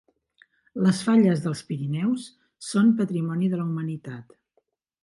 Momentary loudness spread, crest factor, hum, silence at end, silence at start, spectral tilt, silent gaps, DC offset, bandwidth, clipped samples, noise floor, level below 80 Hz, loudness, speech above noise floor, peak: 20 LU; 16 dB; none; 0.8 s; 0.75 s; -7 dB/octave; none; under 0.1%; 11.5 kHz; under 0.1%; -72 dBFS; -68 dBFS; -24 LUFS; 48 dB; -10 dBFS